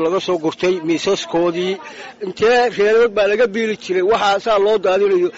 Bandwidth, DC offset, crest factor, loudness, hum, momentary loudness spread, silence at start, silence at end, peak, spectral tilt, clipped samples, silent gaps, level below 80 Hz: 8 kHz; under 0.1%; 10 dB; -16 LUFS; none; 8 LU; 0 s; 0 s; -6 dBFS; -3 dB/octave; under 0.1%; none; -52 dBFS